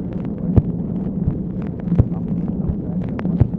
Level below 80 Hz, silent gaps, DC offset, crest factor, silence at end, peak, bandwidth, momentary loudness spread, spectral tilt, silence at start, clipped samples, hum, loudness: -30 dBFS; none; under 0.1%; 18 dB; 0 s; -2 dBFS; 3.6 kHz; 6 LU; -12.5 dB/octave; 0 s; under 0.1%; none; -22 LUFS